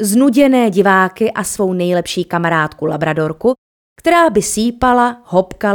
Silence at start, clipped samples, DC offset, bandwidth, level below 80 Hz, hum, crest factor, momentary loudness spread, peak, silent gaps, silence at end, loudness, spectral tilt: 0 s; under 0.1%; under 0.1%; 19 kHz; -42 dBFS; none; 14 dB; 7 LU; 0 dBFS; 3.58-3.96 s; 0 s; -14 LUFS; -5 dB/octave